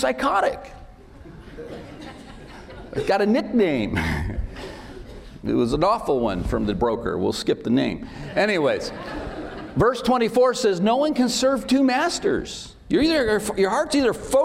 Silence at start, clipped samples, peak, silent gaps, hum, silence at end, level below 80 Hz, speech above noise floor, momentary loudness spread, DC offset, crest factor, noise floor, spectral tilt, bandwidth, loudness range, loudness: 0 s; under 0.1%; -8 dBFS; none; none; 0 s; -40 dBFS; 22 dB; 20 LU; under 0.1%; 14 dB; -43 dBFS; -5 dB/octave; 16 kHz; 5 LU; -22 LUFS